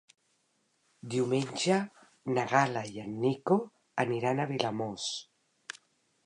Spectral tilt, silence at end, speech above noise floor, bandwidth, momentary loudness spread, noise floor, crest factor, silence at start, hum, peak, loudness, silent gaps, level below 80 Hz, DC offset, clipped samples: -5 dB/octave; 0.5 s; 44 dB; 11 kHz; 18 LU; -74 dBFS; 24 dB; 1.05 s; none; -10 dBFS; -31 LUFS; none; -76 dBFS; under 0.1%; under 0.1%